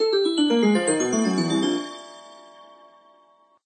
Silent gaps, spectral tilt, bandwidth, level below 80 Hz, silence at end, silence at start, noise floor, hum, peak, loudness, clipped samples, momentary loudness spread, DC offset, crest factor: none; -4 dB/octave; 9.8 kHz; -74 dBFS; 1.05 s; 0 s; -58 dBFS; none; -10 dBFS; -21 LUFS; under 0.1%; 20 LU; under 0.1%; 14 dB